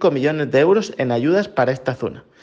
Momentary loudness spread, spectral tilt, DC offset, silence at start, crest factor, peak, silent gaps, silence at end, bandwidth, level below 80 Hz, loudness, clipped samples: 9 LU; -6.5 dB/octave; under 0.1%; 0 s; 14 dB; -4 dBFS; none; 0.25 s; 7.6 kHz; -58 dBFS; -18 LUFS; under 0.1%